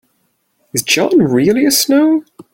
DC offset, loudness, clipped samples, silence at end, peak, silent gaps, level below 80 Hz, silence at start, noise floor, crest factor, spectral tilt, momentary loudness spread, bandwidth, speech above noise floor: under 0.1%; -12 LUFS; under 0.1%; 0.35 s; 0 dBFS; none; -54 dBFS; 0.75 s; -63 dBFS; 14 dB; -3.5 dB/octave; 8 LU; 17 kHz; 51 dB